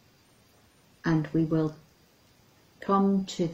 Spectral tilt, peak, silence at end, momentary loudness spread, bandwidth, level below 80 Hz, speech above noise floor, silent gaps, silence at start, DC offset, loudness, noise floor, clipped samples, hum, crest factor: -7.5 dB/octave; -14 dBFS; 0 s; 10 LU; 8.2 kHz; -60 dBFS; 35 dB; none; 1.05 s; under 0.1%; -28 LUFS; -61 dBFS; under 0.1%; none; 16 dB